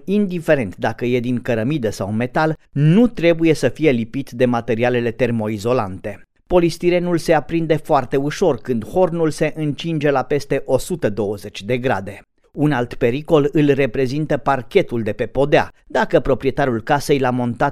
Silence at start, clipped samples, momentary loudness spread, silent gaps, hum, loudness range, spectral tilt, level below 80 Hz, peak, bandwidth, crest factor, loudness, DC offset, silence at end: 0 s; under 0.1%; 7 LU; none; none; 3 LU; -6.5 dB/octave; -40 dBFS; 0 dBFS; 15 kHz; 18 dB; -18 LUFS; under 0.1%; 0 s